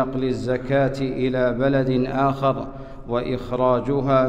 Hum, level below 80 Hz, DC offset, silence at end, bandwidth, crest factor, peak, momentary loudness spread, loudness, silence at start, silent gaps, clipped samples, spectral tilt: none; -40 dBFS; under 0.1%; 0 s; 8.8 kHz; 16 dB; -6 dBFS; 7 LU; -22 LUFS; 0 s; none; under 0.1%; -8 dB/octave